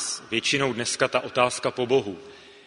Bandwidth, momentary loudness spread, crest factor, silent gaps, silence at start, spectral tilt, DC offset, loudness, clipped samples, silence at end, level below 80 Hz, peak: 11 kHz; 4 LU; 22 dB; none; 0 s; -3 dB/octave; under 0.1%; -24 LUFS; under 0.1%; 0.15 s; -64 dBFS; -4 dBFS